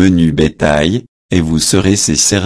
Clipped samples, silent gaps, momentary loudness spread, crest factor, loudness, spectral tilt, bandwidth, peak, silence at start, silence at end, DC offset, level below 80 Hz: under 0.1%; 1.08-1.29 s; 6 LU; 12 dB; -12 LUFS; -4 dB/octave; 11 kHz; 0 dBFS; 0 s; 0 s; under 0.1%; -30 dBFS